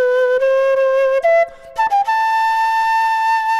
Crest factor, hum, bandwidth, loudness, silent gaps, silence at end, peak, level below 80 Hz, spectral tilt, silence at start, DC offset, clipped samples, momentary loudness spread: 8 dB; none; 13 kHz; -15 LUFS; none; 0 s; -6 dBFS; -54 dBFS; 0 dB/octave; 0 s; under 0.1%; under 0.1%; 2 LU